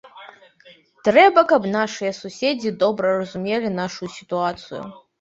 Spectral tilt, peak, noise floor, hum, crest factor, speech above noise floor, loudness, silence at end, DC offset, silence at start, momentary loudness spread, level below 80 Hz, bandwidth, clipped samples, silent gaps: -5 dB/octave; -2 dBFS; -45 dBFS; none; 20 dB; 25 dB; -20 LUFS; 0.25 s; under 0.1%; 0.05 s; 19 LU; -62 dBFS; 8 kHz; under 0.1%; none